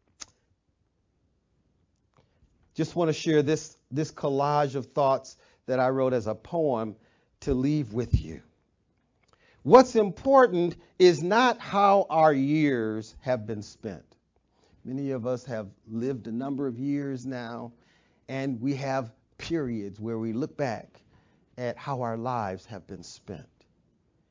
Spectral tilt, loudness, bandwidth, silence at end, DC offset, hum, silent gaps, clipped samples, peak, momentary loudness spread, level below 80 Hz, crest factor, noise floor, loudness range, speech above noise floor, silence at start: -6.5 dB/octave; -26 LUFS; 7.6 kHz; 0.9 s; under 0.1%; none; none; under 0.1%; -4 dBFS; 20 LU; -48 dBFS; 24 dB; -73 dBFS; 12 LU; 47 dB; 2.75 s